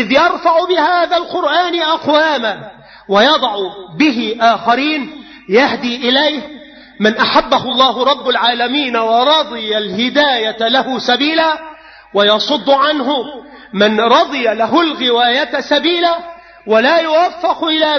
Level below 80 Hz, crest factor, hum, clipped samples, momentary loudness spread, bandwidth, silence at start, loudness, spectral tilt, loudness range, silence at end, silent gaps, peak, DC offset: -52 dBFS; 14 dB; none; under 0.1%; 9 LU; 6.6 kHz; 0 s; -13 LUFS; -4 dB/octave; 1 LU; 0 s; none; 0 dBFS; under 0.1%